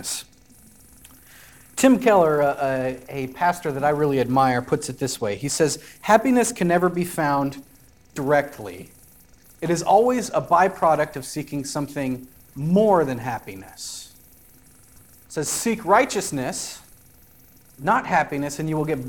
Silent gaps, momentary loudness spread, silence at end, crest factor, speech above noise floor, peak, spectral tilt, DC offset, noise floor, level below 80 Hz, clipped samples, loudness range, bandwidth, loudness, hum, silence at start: none; 16 LU; 0 s; 20 dB; 31 dB; -2 dBFS; -5 dB/octave; 0.2%; -52 dBFS; -56 dBFS; under 0.1%; 4 LU; 18 kHz; -22 LUFS; none; 0 s